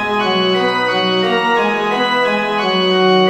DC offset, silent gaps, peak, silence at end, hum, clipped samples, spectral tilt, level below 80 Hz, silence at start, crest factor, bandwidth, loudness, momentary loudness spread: under 0.1%; none; -2 dBFS; 0 s; none; under 0.1%; -5 dB/octave; -56 dBFS; 0 s; 12 dB; 13.5 kHz; -14 LUFS; 2 LU